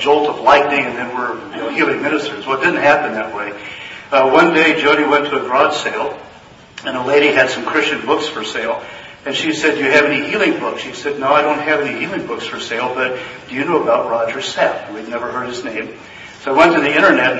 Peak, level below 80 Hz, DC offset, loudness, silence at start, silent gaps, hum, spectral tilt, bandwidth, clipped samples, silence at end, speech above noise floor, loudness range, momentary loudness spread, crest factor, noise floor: 0 dBFS; -56 dBFS; under 0.1%; -15 LUFS; 0 s; none; none; -4 dB/octave; 8 kHz; under 0.1%; 0 s; 25 dB; 5 LU; 14 LU; 16 dB; -41 dBFS